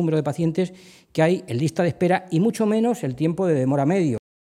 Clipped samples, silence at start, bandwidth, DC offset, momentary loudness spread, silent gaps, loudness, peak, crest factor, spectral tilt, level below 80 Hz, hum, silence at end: under 0.1%; 0 s; 14.5 kHz; under 0.1%; 4 LU; none; -22 LUFS; -6 dBFS; 14 dB; -7.5 dB/octave; -62 dBFS; none; 0.25 s